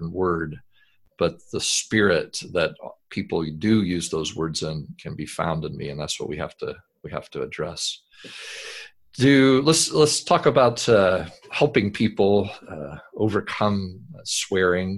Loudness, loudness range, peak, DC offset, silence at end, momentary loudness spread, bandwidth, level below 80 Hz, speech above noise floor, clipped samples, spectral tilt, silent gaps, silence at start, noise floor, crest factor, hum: -22 LUFS; 11 LU; -2 dBFS; under 0.1%; 0 s; 18 LU; 12.5 kHz; -48 dBFS; 39 dB; under 0.1%; -4.5 dB/octave; none; 0 s; -62 dBFS; 22 dB; none